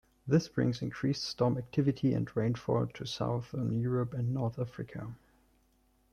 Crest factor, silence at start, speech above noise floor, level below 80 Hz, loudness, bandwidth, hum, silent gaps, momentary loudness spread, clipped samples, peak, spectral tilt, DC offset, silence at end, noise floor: 20 dB; 0.25 s; 38 dB; -62 dBFS; -33 LUFS; 10 kHz; none; none; 9 LU; under 0.1%; -14 dBFS; -7 dB/octave; under 0.1%; 0.95 s; -70 dBFS